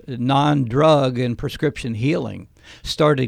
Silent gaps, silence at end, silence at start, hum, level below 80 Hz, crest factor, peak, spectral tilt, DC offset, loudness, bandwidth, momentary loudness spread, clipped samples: none; 0 s; 0.1 s; none; -44 dBFS; 16 dB; -4 dBFS; -6.5 dB/octave; under 0.1%; -19 LUFS; 14.5 kHz; 14 LU; under 0.1%